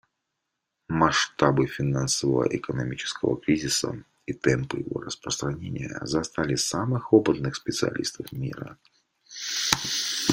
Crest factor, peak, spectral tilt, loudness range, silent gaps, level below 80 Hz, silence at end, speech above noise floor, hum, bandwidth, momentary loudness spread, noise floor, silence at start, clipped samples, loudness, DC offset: 26 dB; -2 dBFS; -4 dB/octave; 3 LU; none; -54 dBFS; 0 s; 56 dB; none; 16.5 kHz; 12 LU; -82 dBFS; 0.9 s; under 0.1%; -26 LUFS; under 0.1%